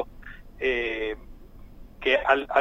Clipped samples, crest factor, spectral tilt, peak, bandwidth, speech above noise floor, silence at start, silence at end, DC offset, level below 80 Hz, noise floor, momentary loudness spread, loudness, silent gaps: under 0.1%; 22 dB; -5 dB/octave; -6 dBFS; 15 kHz; 21 dB; 0 s; 0 s; under 0.1%; -46 dBFS; -45 dBFS; 20 LU; -26 LUFS; none